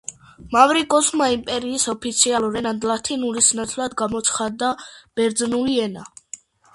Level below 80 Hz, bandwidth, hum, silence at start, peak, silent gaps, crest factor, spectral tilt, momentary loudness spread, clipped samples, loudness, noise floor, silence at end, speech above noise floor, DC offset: -54 dBFS; 11.5 kHz; none; 0.1 s; 0 dBFS; none; 20 dB; -2 dB/octave; 16 LU; under 0.1%; -20 LUFS; -42 dBFS; 0.4 s; 22 dB; under 0.1%